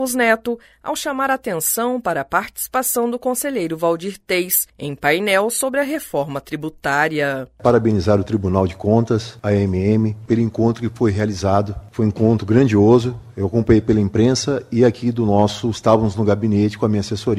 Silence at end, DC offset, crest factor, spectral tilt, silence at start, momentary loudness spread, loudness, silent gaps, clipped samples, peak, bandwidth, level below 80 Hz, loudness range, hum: 0 s; under 0.1%; 18 dB; -5.5 dB/octave; 0 s; 7 LU; -18 LUFS; none; under 0.1%; 0 dBFS; 16 kHz; -44 dBFS; 4 LU; none